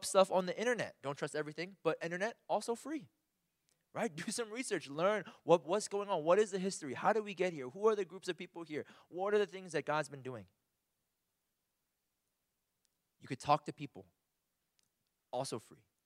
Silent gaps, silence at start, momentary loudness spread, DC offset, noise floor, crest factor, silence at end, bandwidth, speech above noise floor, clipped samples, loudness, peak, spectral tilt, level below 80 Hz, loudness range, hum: none; 0 s; 14 LU; under 0.1%; -86 dBFS; 24 dB; 0.3 s; 15 kHz; 50 dB; under 0.1%; -37 LUFS; -14 dBFS; -4.5 dB/octave; -84 dBFS; 8 LU; none